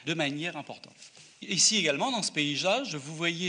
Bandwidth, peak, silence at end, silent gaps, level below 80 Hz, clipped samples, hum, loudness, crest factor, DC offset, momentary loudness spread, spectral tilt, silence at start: 10 kHz; -10 dBFS; 0 s; none; -78 dBFS; under 0.1%; none; -27 LUFS; 20 dB; under 0.1%; 20 LU; -2 dB/octave; 0 s